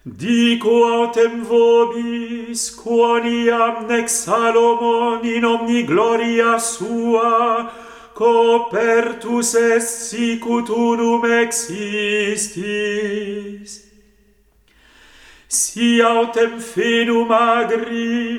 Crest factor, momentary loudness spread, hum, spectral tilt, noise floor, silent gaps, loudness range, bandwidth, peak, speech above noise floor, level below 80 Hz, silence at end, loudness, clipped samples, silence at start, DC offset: 16 dB; 8 LU; none; -3 dB/octave; -55 dBFS; none; 6 LU; 15.5 kHz; -2 dBFS; 39 dB; -58 dBFS; 0 s; -17 LUFS; under 0.1%; 0.05 s; under 0.1%